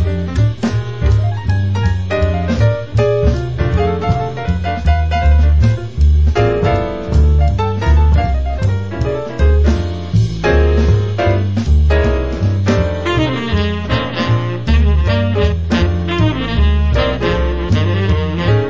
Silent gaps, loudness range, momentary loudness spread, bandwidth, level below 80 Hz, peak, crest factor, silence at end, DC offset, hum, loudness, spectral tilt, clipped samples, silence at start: none; 2 LU; 5 LU; 7.6 kHz; -16 dBFS; -2 dBFS; 12 dB; 0 s; 2%; none; -15 LUFS; -7.5 dB/octave; under 0.1%; 0 s